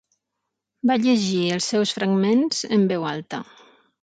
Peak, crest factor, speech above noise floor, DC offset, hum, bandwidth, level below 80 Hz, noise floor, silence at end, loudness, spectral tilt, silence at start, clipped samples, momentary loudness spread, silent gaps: -8 dBFS; 14 dB; 60 dB; under 0.1%; none; 9.4 kHz; -68 dBFS; -81 dBFS; 0.6 s; -21 LUFS; -5 dB/octave; 0.85 s; under 0.1%; 10 LU; none